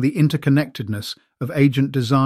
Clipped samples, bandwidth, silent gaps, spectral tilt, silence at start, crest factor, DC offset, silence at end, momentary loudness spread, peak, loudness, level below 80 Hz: under 0.1%; 14.5 kHz; none; -7 dB/octave; 0 s; 16 dB; under 0.1%; 0 s; 11 LU; -4 dBFS; -20 LUFS; -58 dBFS